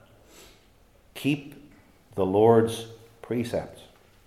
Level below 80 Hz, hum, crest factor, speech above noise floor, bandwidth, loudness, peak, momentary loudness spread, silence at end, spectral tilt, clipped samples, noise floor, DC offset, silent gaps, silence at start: -60 dBFS; none; 22 dB; 35 dB; 14.5 kHz; -25 LUFS; -6 dBFS; 25 LU; 0.55 s; -6.5 dB/octave; under 0.1%; -58 dBFS; under 0.1%; none; 1.15 s